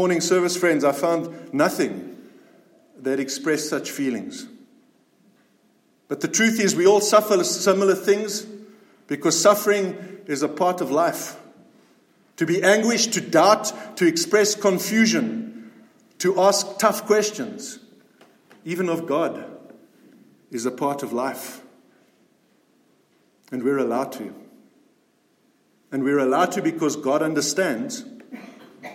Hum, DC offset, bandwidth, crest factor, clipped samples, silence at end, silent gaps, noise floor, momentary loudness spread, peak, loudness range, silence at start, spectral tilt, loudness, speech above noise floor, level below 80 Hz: none; under 0.1%; 16.5 kHz; 20 dB; under 0.1%; 0 s; none; -63 dBFS; 18 LU; -2 dBFS; 10 LU; 0 s; -3.5 dB/octave; -21 LUFS; 42 dB; -76 dBFS